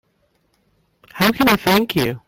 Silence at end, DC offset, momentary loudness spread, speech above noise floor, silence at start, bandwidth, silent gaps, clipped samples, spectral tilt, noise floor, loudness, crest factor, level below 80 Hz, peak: 0.1 s; under 0.1%; 5 LU; 48 dB; 1.15 s; 16.5 kHz; none; under 0.1%; -4.5 dB/octave; -64 dBFS; -16 LUFS; 18 dB; -48 dBFS; -2 dBFS